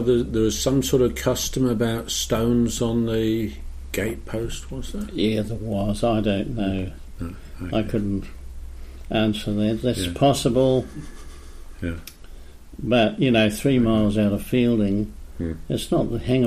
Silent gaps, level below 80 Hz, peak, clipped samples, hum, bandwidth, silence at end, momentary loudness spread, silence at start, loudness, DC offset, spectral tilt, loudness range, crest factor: none; -36 dBFS; -6 dBFS; under 0.1%; none; 15.5 kHz; 0 s; 16 LU; 0 s; -23 LUFS; under 0.1%; -5.5 dB/octave; 5 LU; 16 dB